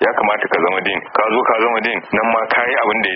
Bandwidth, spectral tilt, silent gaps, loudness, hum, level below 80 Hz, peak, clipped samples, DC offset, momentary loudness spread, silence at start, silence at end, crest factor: 5.2 kHz; -1 dB/octave; none; -16 LUFS; none; -56 dBFS; -2 dBFS; under 0.1%; under 0.1%; 3 LU; 0 s; 0 s; 14 dB